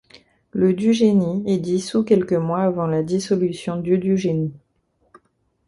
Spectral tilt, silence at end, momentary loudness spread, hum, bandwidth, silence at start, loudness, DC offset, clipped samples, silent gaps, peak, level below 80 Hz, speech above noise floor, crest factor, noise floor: -7 dB/octave; 1.1 s; 6 LU; none; 11.5 kHz; 0.15 s; -20 LUFS; under 0.1%; under 0.1%; none; -4 dBFS; -56 dBFS; 47 dB; 16 dB; -66 dBFS